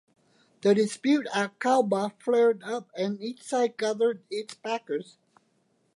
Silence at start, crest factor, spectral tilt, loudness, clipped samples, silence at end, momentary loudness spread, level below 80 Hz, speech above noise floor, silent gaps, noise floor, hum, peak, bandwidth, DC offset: 0.65 s; 16 dB; -5 dB/octave; -27 LUFS; under 0.1%; 0.95 s; 11 LU; -82 dBFS; 43 dB; none; -70 dBFS; none; -10 dBFS; 11.5 kHz; under 0.1%